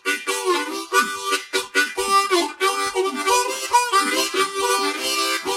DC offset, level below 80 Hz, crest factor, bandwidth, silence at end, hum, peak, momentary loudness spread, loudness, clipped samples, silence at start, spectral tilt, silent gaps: under 0.1%; -62 dBFS; 16 dB; 16 kHz; 0 s; none; -4 dBFS; 5 LU; -20 LUFS; under 0.1%; 0.05 s; 0 dB/octave; none